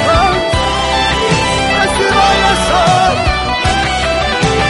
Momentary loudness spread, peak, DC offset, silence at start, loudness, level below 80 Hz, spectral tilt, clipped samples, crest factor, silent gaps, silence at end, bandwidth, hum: 4 LU; 0 dBFS; under 0.1%; 0 s; -11 LUFS; -24 dBFS; -4 dB/octave; under 0.1%; 12 dB; none; 0 s; 11.5 kHz; none